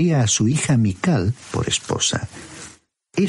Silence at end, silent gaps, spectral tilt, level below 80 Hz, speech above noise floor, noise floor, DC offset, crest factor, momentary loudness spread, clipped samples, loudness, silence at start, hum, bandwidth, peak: 0 s; none; -4.5 dB/octave; -48 dBFS; 29 dB; -49 dBFS; under 0.1%; 14 dB; 19 LU; under 0.1%; -20 LUFS; 0 s; none; 11.5 kHz; -6 dBFS